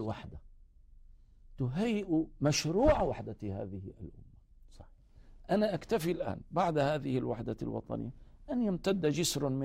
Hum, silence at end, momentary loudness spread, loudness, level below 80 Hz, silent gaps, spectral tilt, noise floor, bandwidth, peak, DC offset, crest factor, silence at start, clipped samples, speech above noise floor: none; 0 s; 15 LU; -33 LUFS; -50 dBFS; none; -5.5 dB/octave; -57 dBFS; 16 kHz; -14 dBFS; under 0.1%; 20 dB; 0 s; under 0.1%; 25 dB